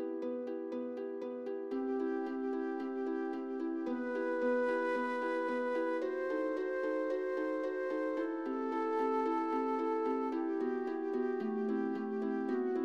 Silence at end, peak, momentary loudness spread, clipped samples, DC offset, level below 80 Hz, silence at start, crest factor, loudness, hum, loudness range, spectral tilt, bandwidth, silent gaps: 0 s; -24 dBFS; 6 LU; under 0.1%; under 0.1%; -80 dBFS; 0 s; 12 dB; -36 LUFS; none; 3 LU; -6.5 dB/octave; 8 kHz; none